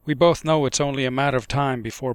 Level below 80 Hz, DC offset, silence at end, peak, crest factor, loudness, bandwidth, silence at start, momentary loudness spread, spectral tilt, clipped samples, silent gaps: -46 dBFS; under 0.1%; 0 s; -4 dBFS; 16 dB; -21 LUFS; 16 kHz; 0.05 s; 6 LU; -5 dB/octave; under 0.1%; none